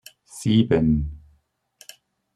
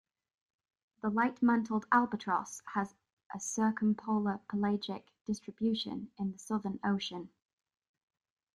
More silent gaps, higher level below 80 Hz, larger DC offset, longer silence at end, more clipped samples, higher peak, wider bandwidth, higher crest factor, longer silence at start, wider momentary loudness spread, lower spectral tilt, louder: second, none vs 3.13-3.17 s, 3.26-3.30 s, 5.21-5.25 s; first, -40 dBFS vs -72 dBFS; neither; about the same, 1.2 s vs 1.25 s; neither; first, -6 dBFS vs -12 dBFS; about the same, 12.5 kHz vs 12 kHz; second, 18 dB vs 24 dB; second, 0.35 s vs 1.05 s; first, 16 LU vs 12 LU; first, -7 dB/octave vs -5 dB/octave; first, -21 LUFS vs -34 LUFS